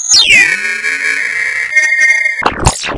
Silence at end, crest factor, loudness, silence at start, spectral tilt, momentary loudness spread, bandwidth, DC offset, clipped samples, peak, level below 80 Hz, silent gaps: 0 s; 12 dB; -9 LUFS; 0 s; -1 dB/octave; 9 LU; 12 kHz; under 0.1%; 0.5%; 0 dBFS; -30 dBFS; none